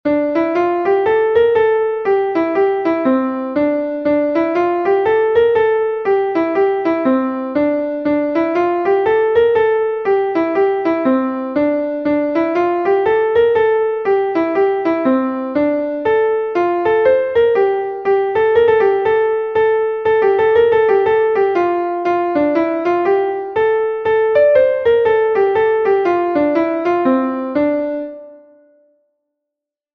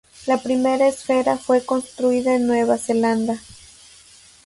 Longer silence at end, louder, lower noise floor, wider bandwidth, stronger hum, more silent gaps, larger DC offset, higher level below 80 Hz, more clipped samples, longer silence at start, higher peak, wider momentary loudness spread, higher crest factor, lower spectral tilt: first, 1.6 s vs 1.05 s; first, -15 LUFS vs -20 LUFS; first, -83 dBFS vs -48 dBFS; second, 5.8 kHz vs 11.5 kHz; neither; neither; neither; first, -52 dBFS vs -58 dBFS; neither; second, 0.05 s vs 0.2 s; about the same, -2 dBFS vs -4 dBFS; about the same, 5 LU vs 5 LU; about the same, 14 dB vs 16 dB; first, -7.5 dB/octave vs -4.5 dB/octave